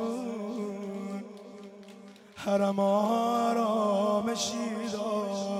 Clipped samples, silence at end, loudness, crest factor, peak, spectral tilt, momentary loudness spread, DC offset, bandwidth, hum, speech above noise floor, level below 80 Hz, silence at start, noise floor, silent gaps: under 0.1%; 0 s; -29 LUFS; 14 dB; -16 dBFS; -5 dB/octave; 21 LU; under 0.1%; 14.5 kHz; none; 22 dB; -74 dBFS; 0 s; -50 dBFS; none